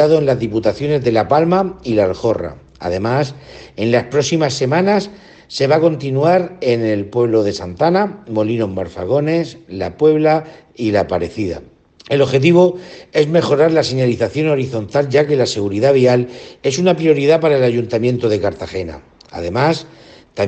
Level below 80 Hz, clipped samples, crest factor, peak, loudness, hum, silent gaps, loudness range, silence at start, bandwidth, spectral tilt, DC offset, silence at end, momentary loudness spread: -50 dBFS; under 0.1%; 16 dB; 0 dBFS; -16 LUFS; none; none; 3 LU; 0 s; 8.6 kHz; -6.5 dB/octave; under 0.1%; 0 s; 12 LU